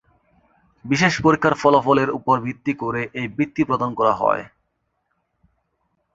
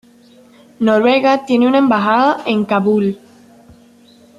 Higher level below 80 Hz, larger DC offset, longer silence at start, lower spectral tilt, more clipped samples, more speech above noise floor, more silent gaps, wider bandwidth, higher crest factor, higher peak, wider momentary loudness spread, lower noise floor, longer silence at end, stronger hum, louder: first, -54 dBFS vs -60 dBFS; neither; about the same, 0.85 s vs 0.8 s; about the same, -6 dB/octave vs -6.5 dB/octave; neither; first, 53 dB vs 33 dB; neither; second, 7.8 kHz vs 11.5 kHz; first, 20 dB vs 14 dB; about the same, -2 dBFS vs -2 dBFS; first, 9 LU vs 6 LU; first, -73 dBFS vs -46 dBFS; first, 1.65 s vs 1.2 s; neither; second, -20 LUFS vs -14 LUFS